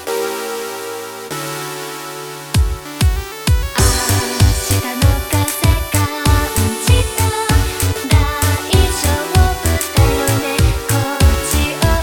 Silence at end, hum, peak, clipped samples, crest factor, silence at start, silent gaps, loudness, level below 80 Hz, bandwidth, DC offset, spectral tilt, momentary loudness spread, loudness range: 0 s; none; 0 dBFS; under 0.1%; 14 dB; 0 s; none; -16 LUFS; -20 dBFS; over 20 kHz; under 0.1%; -4.5 dB/octave; 10 LU; 4 LU